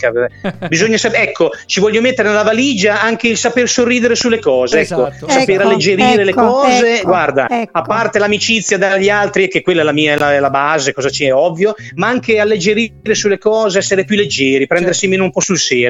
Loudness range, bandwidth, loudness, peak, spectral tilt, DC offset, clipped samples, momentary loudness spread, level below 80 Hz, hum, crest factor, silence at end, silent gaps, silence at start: 2 LU; 9.8 kHz; -12 LUFS; 0 dBFS; -3.5 dB/octave; under 0.1%; under 0.1%; 5 LU; -48 dBFS; none; 12 dB; 0 s; none; 0 s